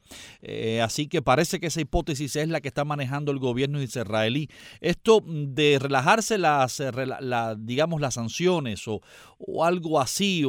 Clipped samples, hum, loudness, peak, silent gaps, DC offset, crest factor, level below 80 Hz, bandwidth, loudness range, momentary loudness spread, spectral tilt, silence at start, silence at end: under 0.1%; none; -25 LUFS; -4 dBFS; none; under 0.1%; 20 dB; -46 dBFS; 19.5 kHz; 4 LU; 10 LU; -4.5 dB/octave; 0.1 s; 0 s